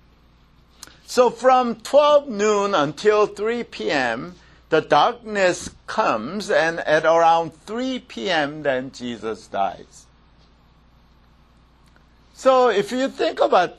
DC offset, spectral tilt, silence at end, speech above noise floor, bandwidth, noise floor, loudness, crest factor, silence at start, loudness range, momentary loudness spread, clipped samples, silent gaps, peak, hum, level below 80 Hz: under 0.1%; -4 dB/octave; 0.05 s; 34 dB; 13 kHz; -54 dBFS; -20 LUFS; 20 dB; 1.1 s; 10 LU; 12 LU; under 0.1%; none; -2 dBFS; none; -56 dBFS